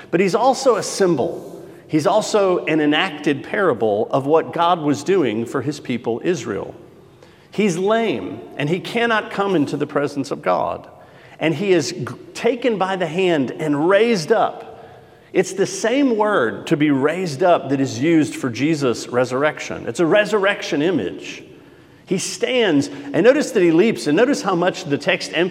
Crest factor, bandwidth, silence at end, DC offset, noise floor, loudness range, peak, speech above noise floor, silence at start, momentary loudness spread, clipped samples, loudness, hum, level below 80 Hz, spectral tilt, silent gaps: 18 dB; 15 kHz; 0 s; under 0.1%; -47 dBFS; 4 LU; -2 dBFS; 28 dB; 0 s; 9 LU; under 0.1%; -19 LUFS; none; -66 dBFS; -5 dB/octave; none